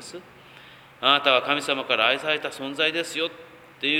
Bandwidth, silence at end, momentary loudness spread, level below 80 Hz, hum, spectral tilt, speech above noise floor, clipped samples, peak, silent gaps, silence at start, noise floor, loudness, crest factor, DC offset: 19.5 kHz; 0 s; 12 LU; -70 dBFS; none; -2.5 dB/octave; 24 dB; under 0.1%; -2 dBFS; none; 0 s; -48 dBFS; -22 LUFS; 22 dB; under 0.1%